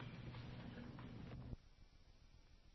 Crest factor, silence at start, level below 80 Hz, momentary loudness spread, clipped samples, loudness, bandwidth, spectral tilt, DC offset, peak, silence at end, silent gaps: 20 dB; 0 s; -62 dBFS; 9 LU; under 0.1%; -55 LUFS; 6 kHz; -6 dB/octave; under 0.1%; -36 dBFS; 0 s; none